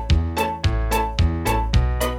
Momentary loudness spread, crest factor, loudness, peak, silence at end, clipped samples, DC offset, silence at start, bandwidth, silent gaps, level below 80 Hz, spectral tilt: 2 LU; 14 dB; -22 LUFS; -6 dBFS; 0 s; under 0.1%; under 0.1%; 0 s; 17 kHz; none; -22 dBFS; -5.5 dB/octave